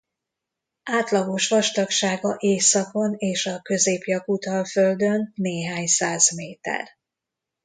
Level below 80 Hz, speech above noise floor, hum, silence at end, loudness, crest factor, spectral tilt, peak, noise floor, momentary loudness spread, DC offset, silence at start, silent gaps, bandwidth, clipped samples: -70 dBFS; 63 dB; none; 0.75 s; -22 LUFS; 20 dB; -3 dB/octave; -4 dBFS; -85 dBFS; 10 LU; under 0.1%; 0.85 s; none; 9.6 kHz; under 0.1%